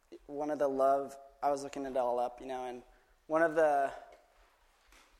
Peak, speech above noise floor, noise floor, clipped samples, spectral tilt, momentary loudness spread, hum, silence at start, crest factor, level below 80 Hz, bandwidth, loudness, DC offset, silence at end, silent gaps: -16 dBFS; 34 dB; -67 dBFS; under 0.1%; -5 dB/octave; 16 LU; none; 0.1 s; 18 dB; -68 dBFS; 13 kHz; -33 LUFS; under 0.1%; 1.05 s; none